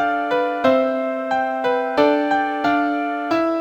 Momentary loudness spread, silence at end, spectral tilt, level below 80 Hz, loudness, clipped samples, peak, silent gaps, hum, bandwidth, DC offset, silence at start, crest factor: 4 LU; 0 s; -5.5 dB/octave; -60 dBFS; -19 LUFS; under 0.1%; -2 dBFS; none; none; 8.8 kHz; under 0.1%; 0 s; 18 dB